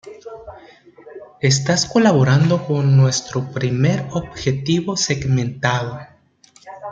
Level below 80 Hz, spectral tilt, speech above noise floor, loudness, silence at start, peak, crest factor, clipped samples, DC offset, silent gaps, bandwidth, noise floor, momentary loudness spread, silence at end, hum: -50 dBFS; -5 dB/octave; 35 dB; -18 LUFS; 0.05 s; -2 dBFS; 16 dB; under 0.1%; under 0.1%; none; 8.8 kHz; -52 dBFS; 19 LU; 0 s; none